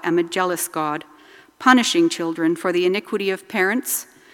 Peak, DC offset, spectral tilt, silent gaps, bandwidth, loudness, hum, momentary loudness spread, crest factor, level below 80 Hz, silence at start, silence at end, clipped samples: 0 dBFS; under 0.1%; -3 dB/octave; none; 17.5 kHz; -20 LUFS; none; 10 LU; 20 dB; -72 dBFS; 0 s; 0.3 s; under 0.1%